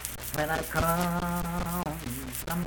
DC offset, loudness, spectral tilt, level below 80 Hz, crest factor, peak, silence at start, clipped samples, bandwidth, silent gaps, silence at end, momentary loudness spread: under 0.1%; -30 LUFS; -4.5 dB/octave; -42 dBFS; 22 dB; -8 dBFS; 0 s; under 0.1%; 19 kHz; none; 0 s; 8 LU